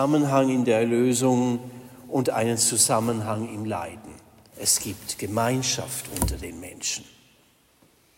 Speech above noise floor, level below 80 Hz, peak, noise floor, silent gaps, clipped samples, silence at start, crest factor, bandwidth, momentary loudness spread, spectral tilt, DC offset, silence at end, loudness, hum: 36 dB; -46 dBFS; -6 dBFS; -61 dBFS; none; under 0.1%; 0 s; 20 dB; 16.5 kHz; 12 LU; -4 dB/octave; under 0.1%; 1.15 s; -24 LUFS; none